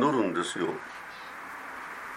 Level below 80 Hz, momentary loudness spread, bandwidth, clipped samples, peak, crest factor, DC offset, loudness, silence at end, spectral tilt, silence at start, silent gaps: -70 dBFS; 14 LU; 16 kHz; under 0.1%; -12 dBFS; 18 dB; under 0.1%; -33 LUFS; 0 s; -4.5 dB/octave; 0 s; none